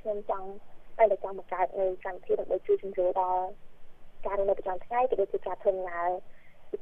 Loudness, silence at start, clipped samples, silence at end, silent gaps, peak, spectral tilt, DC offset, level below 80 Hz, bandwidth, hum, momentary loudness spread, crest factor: -30 LUFS; 0.05 s; under 0.1%; 0 s; none; -10 dBFS; -8 dB/octave; under 0.1%; -52 dBFS; 3.8 kHz; none; 12 LU; 20 dB